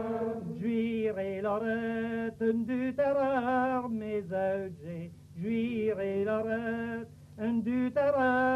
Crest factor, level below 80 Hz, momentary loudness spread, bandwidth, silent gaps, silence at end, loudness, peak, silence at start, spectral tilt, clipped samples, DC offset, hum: 14 dB; -64 dBFS; 10 LU; 7.4 kHz; none; 0 s; -31 LUFS; -18 dBFS; 0 s; -8 dB/octave; under 0.1%; under 0.1%; 50 Hz at -70 dBFS